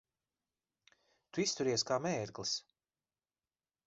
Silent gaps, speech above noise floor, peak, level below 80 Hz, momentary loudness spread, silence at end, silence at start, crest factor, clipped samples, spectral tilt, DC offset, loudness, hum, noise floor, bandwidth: none; over 54 dB; -20 dBFS; -76 dBFS; 6 LU; 1.25 s; 1.35 s; 20 dB; under 0.1%; -3.5 dB/octave; under 0.1%; -36 LUFS; none; under -90 dBFS; 7.6 kHz